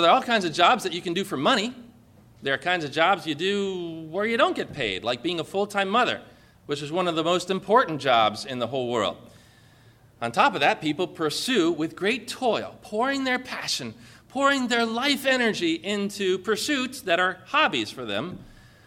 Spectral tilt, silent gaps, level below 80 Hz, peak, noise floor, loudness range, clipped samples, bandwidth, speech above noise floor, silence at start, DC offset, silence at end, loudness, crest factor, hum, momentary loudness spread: -3.5 dB/octave; none; -62 dBFS; -4 dBFS; -54 dBFS; 2 LU; under 0.1%; 16.5 kHz; 30 dB; 0 s; under 0.1%; 0.35 s; -24 LUFS; 20 dB; none; 9 LU